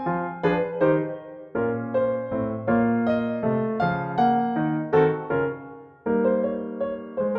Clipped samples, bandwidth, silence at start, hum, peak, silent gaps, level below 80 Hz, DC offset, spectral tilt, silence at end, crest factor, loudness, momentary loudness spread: under 0.1%; 5.4 kHz; 0 s; none; -8 dBFS; none; -56 dBFS; under 0.1%; -10 dB/octave; 0 s; 16 dB; -24 LUFS; 8 LU